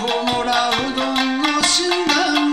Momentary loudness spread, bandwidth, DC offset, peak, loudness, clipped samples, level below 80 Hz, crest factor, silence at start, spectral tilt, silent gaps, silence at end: 4 LU; 16 kHz; 0.4%; -2 dBFS; -17 LUFS; under 0.1%; -50 dBFS; 16 dB; 0 s; -1.5 dB/octave; none; 0 s